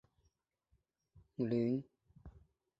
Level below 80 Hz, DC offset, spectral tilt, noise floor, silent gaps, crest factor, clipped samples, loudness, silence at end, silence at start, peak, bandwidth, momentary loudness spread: -68 dBFS; under 0.1%; -9 dB/octave; -80 dBFS; none; 18 dB; under 0.1%; -38 LUFS; 0.4 s; 1.15 s; -24 dBFS; 5.6 kHz; 25 LU